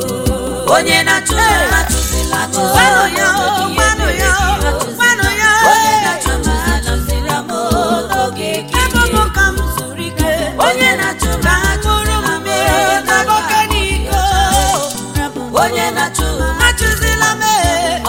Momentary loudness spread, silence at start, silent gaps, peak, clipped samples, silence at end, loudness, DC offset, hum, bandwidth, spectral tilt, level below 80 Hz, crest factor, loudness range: 7 LU; 0 s; none; 0 dBFS; under 0.1%; 0 s; -13 LUFS; under 0.1%; none; 17 kHz; -3 dB/octave; -22 dBFS; 14 dB; 3 LU